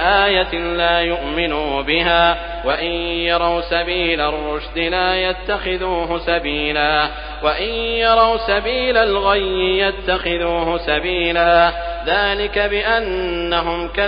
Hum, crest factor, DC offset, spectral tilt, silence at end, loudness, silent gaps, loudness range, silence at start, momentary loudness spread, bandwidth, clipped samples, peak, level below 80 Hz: none; 16 dB; under 0.1%; -1 dB/octave; 0 s; -17 LUFS; none; 2 LU; 0 s; 7 LU; 5.2 kHz; under 0.1%; 0 dBFS; -32 dBFS